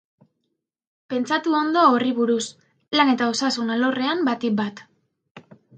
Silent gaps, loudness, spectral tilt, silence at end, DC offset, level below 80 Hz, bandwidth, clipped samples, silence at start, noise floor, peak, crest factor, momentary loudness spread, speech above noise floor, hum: 5.31-5.35 s; -21 LUFS; -4 dB/octave; 0.35 s; under 0.1%; -74 dBFS; 9.4 kHz; under 0.1%; 1.1 s; -78 dBFS; -4 dBFS; 18 dB; 9 LU; 57 dB; none